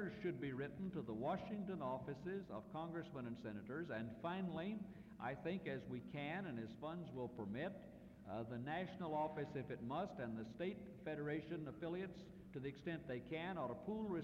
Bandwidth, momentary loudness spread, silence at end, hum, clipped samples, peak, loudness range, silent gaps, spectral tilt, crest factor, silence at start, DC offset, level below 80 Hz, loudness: 10.5 kHz; 6 LU; 0 s; none; under 0.1%; -32 dBFS; 2 LU; none; -8 dB/octave; 14 dB; 0 s; under 0.1%; -72 dBFS; -48 LUFS